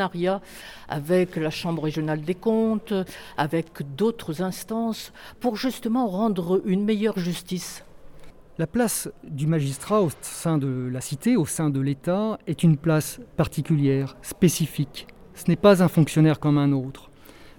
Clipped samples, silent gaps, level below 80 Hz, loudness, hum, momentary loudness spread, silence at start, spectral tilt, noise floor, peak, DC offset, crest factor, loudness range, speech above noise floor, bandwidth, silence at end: under 0.1%; none; -52 dBFS; -24 LUFS; none; 12 LU; 0 s; -6 dB/octave; -43 dBFS; -4 dBFS; under 0.1%; 20 dB; 5 LU; 19 dB; 18 kHz; 0.1 s